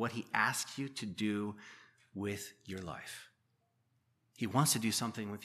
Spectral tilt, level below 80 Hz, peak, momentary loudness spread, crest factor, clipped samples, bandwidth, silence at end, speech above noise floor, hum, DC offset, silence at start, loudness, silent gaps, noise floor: -3.5 dB/octave; -76 dBFS; -14 dBFS; 18 LU; 24 dB; under 0.1%; 15 kHz; 0 s; 41 dB; none; under 0.1%; 0 s; -36 LUFS; none; -78 dBFS